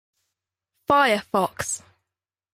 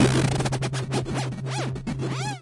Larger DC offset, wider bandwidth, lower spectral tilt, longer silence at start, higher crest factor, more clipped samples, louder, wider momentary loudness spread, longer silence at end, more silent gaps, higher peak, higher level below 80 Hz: neither; first, 16 kHz vs 11.5 kHz; second, -3 dB/octave vs -5.5 dB/octave; first, 0.9 s vs 0 s; about the same, 20 dB vs 18 dB; neither; first, -22 LUFS vs -27 LUFS; first, 13 LU vs 6 LU; first, 0.75 s vs 0 s; neither; about the same, -6 dBFS vs -6 dBFS; second, -60 dBFS vs -44 dBFS